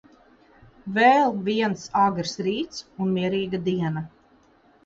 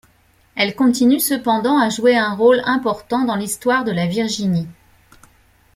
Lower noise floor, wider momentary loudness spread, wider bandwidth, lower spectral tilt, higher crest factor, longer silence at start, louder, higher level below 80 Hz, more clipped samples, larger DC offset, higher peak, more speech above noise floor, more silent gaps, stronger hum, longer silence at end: about the same, -58 dBFS vs -56 dBFS; first, 14 LU vs 6 LU; second, 7.8 kHz vs 16 kHz; about the same, -5.5 dB/octave vs -4.5 dB/octave; about the same, 18 dB vs 16 dB; first, 0.85 s vs 0.55 s; second, -23 LUFS vs -17 LUFS; about the same, -60 dBFS vs -56 dBFS; neither; neither; second, -6 dBFS vs -2 dBFS; second, 35 dB vs 39 dB; neither; neither; second, 0.8 s vs 1.05 s